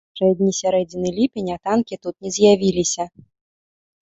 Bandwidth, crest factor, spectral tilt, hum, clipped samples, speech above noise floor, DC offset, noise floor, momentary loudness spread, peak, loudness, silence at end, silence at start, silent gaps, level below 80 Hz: 8.2 kHz; 18 dB; -5 dB/octave; none; under 0.1%; over 71 dB; under 0.1%; under -90 dBFS; 11 LU; -2 dBFS; -20 LUFS; 1.05 s; 0.15 s; none; -54 dBFS